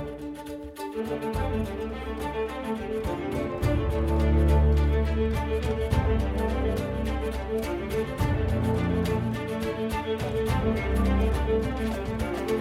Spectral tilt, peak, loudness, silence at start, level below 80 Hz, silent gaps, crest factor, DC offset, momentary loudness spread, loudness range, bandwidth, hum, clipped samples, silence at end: -7.5 dB/octave; -10 dBFS; -28 LUFS; 0 s; -32 dBFS; none; 16 dB; under 0.1%; 8 LU; 5 LU; 14.5 kHz; none; under 0.1%; 0 s